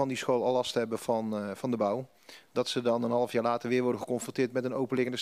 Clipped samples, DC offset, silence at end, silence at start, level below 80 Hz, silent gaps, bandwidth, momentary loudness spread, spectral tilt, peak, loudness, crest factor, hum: under 0.1%; under 0.1%; 0 s; 0 s; -78 dBFS; none; 15 kHz; 6 LU; -5 dB/octave; -14 dBFS; -30 LUFS; 16 dB; none